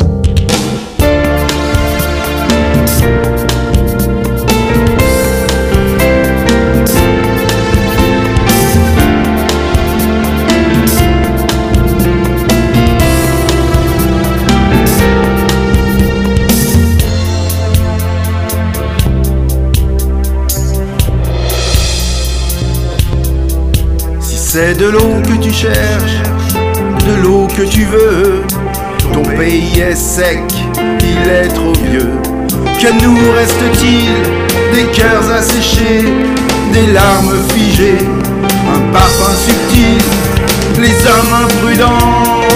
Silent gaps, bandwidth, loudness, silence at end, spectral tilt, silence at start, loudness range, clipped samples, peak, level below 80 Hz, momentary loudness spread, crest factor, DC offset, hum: none; 16.5 kHz; -10 LUFS; 0 s; -5 dB/octave; 0 s; 4 LU; 0.3%; 0 dBFS; -16 dBFS; 6 LU; 10 dB; under 0.1%; none